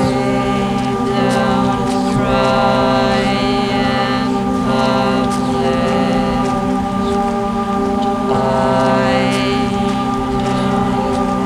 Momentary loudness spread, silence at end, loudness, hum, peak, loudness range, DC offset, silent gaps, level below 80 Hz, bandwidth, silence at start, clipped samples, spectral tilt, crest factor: 4 LU; 0 s; -15 LUFS; none; 0 dBFS; 1 LU; under 0.1%; none; -34 dBFS; 13.5 kHz; 0 s; under 0.1%; -6 dB/octave; 14 dB